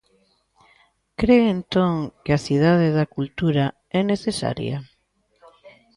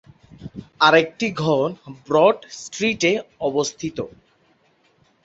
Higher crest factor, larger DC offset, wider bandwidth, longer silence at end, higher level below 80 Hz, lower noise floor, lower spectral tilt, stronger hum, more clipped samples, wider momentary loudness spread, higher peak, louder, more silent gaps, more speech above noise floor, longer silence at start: about the same, 18 dB vs 20 dB; neither; first, 11.5 kHz vs 8 kHz; second, 0.25 s vs 1.15 s; first, -48 dBFS vs -58 dBFS; first, -66 dBFS vs -61 dBFS; first, -7 dB/octave vs -4 dB/octave; neither; neither; second, 10 LU vs 23 LU; second, -6 dBFS vs -2 dBFS; about the same, -21 LUFS vs -20 LUFS; neither; first, 47 dB vs 41 dB; first, 1.2 s vs 0.4 s